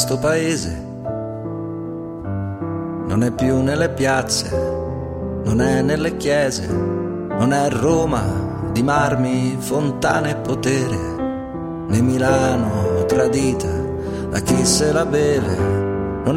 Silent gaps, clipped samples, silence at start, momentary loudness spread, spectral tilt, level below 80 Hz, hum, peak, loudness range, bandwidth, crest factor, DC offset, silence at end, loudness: none; under 0.1%; 0 s; 10 LU; -5.5 dB/octave; -38 dBFS; none; -4 dBFS; 3 LU; 16.5 kHz; 16 dB; under 0.1%; 0 s; -20 LUFS